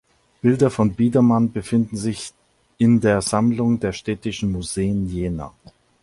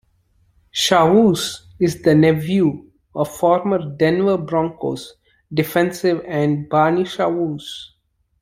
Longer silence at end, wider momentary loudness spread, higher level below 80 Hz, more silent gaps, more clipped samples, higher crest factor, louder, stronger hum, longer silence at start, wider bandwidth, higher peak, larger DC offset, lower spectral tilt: about the same, 0.55 s vs 0.55 s; second, 10 LU vs 13 LU; first, -44 dBFS vs -54 dBFS; neither; neither; about the same, 16 dB vs 16 dB; about the same, -20 LUFS vs -18 LUFS; neither; second, 0.45 s vs 0.75 s; second, 11.5 kHz vs 16 kHz; about the same, -4 dBFS vs -2 dBFS; neither; about the same, -6.5 dB/octave vs -5.5 dB/octave